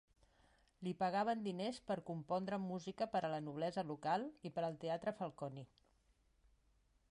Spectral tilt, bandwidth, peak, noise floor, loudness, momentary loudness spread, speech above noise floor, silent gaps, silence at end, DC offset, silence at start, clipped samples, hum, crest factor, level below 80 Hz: -6.5 dB/octave; 11 kHz; -26 dBFS; -76 dBFS; -43 LUFS; 8 LU; 34 dB; none; 1.45 s; under 0.1%; 0.8 s; under 0.1%; none; 18 dB; -76 dBFS